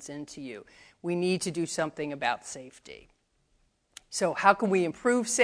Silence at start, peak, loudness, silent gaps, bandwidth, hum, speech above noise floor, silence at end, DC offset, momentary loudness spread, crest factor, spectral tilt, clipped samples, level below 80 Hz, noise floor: 0 s; -6 dBFS; -28 LUFS; none; 11 kHz; none; 41 dB; 0 s; under 0.1%; 20 LU; 24 dB; -4 dB/octave; under 0.1%; -68 dBFS; -70 dBFS